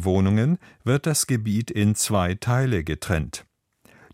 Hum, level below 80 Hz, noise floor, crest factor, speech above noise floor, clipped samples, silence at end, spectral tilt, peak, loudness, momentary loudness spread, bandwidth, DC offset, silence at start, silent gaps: none; -44 dBFS; -58 dBFS; 16 dB; 36 dB; under 0.1%; 0.75 s; -5.5 dB/octave; -6 dBFS; -23 LUFS; 6 LU; 16 kHz; under 0.1%; 0 s; none